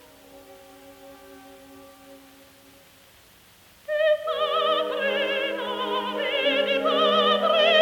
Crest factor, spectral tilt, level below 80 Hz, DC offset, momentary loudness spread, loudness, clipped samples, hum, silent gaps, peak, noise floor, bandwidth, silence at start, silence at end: 18 dB; -3.5 dB/octave; -68 dBFS; under 0.1%; 8 LU; -23 LUFS; under 0.1%; none; none; -6 dBFS; -54 dBFS; 19 kHz; 0.35 s; 0 s